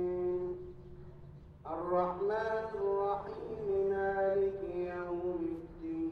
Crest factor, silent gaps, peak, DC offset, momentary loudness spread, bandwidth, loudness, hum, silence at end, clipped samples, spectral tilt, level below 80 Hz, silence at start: 16 dB; none; -20 dBFS; under 0.1%; 19 LU; 6 kHz; -35 LUFS; none; 0 s; under 0.1%; -9 dB/octave; -58 dBFS; 0 s